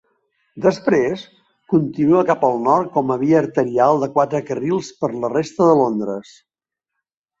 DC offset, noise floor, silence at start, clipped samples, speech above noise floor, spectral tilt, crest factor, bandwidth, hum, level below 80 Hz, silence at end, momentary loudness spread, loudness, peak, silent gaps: under 0.1%; -84 dBFS; 0.55 s; under 0.1%; 66 dB; -7 dB/octave; 16 dB; 7.8 kHz; none; -60 dBFS; 1.2 s; 8 LU; -18 LUFS; -2 dBFS; none